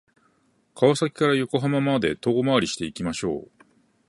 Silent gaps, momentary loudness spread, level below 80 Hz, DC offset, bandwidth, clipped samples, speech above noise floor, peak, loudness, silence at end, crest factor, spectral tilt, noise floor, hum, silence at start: none; 8 LU; -56 dBFS; under 0.1%; 11.5 kHz; under 0.1%; 42 dB; -4 dBFS; -23 LUFS; 0.65 s; 20 dB; -5.5 dB/octave; -65 dBFS; none; 0.75 s